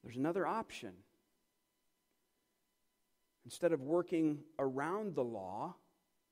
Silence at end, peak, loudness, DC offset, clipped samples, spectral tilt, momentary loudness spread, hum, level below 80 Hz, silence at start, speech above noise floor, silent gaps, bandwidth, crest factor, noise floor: 0.55 s; -22 dBFS; -38 LUFS; under 0.1%; under 0.1%; -6.5 dB/octave; 13 LU; none; -82 dBFS; 0.05 s; 45 dB; none; 15.5 kHz; 18 dB; -82 dBFS